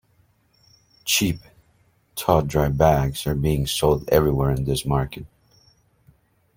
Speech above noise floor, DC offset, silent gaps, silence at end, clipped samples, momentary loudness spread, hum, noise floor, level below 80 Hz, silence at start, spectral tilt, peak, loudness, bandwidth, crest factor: 41 dB; under 0.1%; none; 1.3 s; under 0.1%; 13 LU; none; -62 dBFS; -38 dBFS; 1.05 s; -5 dB/octave; -2 dBFS; -21 LUFS; 16.5 kHz; 20 dB